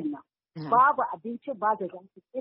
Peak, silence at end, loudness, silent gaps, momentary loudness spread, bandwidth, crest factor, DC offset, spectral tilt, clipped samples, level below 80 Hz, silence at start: -10 dBFS; 0 s; -26 LUFS; none; 20 LU; 5.6 kHz; 18 dB; under 0.1%; -5 dB/octave; under 0.1%; -78 dBFS; 0 s